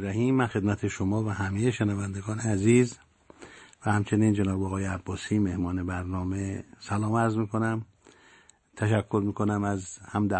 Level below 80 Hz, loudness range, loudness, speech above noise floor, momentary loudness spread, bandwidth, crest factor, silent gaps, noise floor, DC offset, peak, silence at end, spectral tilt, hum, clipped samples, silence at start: -56 dBFS; 3 LU; -28 LUFS; 31 dB; 10 LU; 8.8 kHz; 18 dB; none; -58 dBFS; under 0.1%; -10 dBFS; 0 s; -7 dB/octave; none; under 0.1%; 0 s